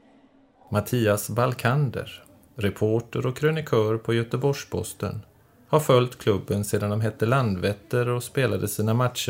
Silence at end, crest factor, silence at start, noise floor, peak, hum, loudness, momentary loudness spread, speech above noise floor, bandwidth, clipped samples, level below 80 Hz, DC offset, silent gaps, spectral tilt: 0 s; 20 dB; 0.7 s; -57 dBFS; -6 dBFS; none; -25 LUFS; 8 LU; 33 dB; 16 kHz; under 0.1%; -60 dBFS; under 0.1%; none; -6 dB/octave